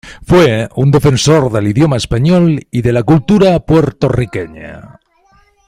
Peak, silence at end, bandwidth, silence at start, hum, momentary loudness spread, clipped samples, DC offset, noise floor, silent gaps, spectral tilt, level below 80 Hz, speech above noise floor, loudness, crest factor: 0 dBFS; 0.8 s; 15.5 kHz; 0.05 s; none; 9 LU; under 0.1%; under 0.1%; -51 dBFS; none; -6.5 dB/octave; -34 dBFS; 40 dB; -11 LUFS; 12 dB